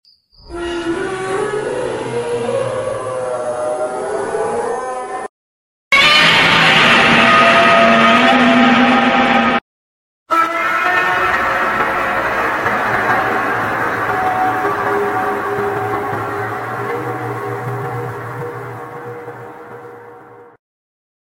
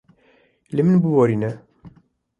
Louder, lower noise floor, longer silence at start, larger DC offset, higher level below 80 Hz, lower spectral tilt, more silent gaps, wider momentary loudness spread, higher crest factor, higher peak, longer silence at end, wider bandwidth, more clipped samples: first, -14 LUFS vs -19 LUFS; second, -39 dBFS vs -58 dBFS; second, 0.45 s vs 0.7 s; neither; first, -46 dBFS vs -60 dBFS; second, -4 dB/octave vs -10 dB/octave; first, 5.29-5.91 s, 9.61-10.26 s vs none; first, 18 LU vs 12 LU; about the same, 16 dB vs 18 dB; first, 0 dBFS vs -4 dBFS; first, 0.8 s vs 0.5 s; first, 16.5 kHz vs 7.4 kHz; neither